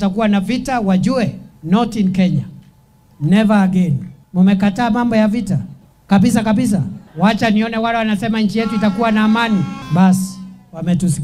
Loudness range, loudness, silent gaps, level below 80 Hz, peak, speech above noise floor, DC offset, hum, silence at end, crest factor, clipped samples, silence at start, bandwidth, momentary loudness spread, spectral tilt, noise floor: 2 LU; -16 LUFS; none; -44 dBFS; 0 dBFS; 35 dB; under 0.1%; none; 0 s; 16 dB; under 0.1%; 0 s; 13 kHz; 10 LU; -6.5 dB/octave; -49 dBFS